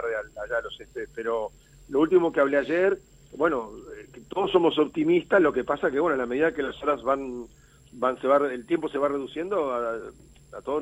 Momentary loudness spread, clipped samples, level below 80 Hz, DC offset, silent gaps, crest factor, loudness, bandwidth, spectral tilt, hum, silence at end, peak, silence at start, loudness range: 16 LU; under 0.1%; -56 dBFS; under 0.1%; none; 20 dB; -25 LUFS; 10.5 kHz; -6 dB/octave; none; 0 s; -6 dBFS; 0 s; 3 LU